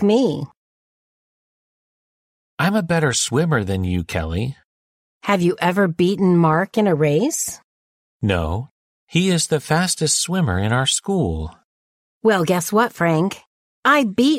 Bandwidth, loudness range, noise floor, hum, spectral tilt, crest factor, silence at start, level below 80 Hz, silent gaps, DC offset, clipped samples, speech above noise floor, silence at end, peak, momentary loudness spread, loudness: 16 kHz; 3 LU; under -90 dBFS; none; -4.5 dB/octave; 16 dB; 0 s; -46 dBFS; 0.57-2.58 s, 4.64-5.21 s, 7.64-8.20 s, 8.71-9.07 s, 11.64-12.21 s, 13.47-13.83 s; under 0.1%; under 0.1%; over 72 dB; 0 s; -4 dBFS; 10 LU; -19 LUFS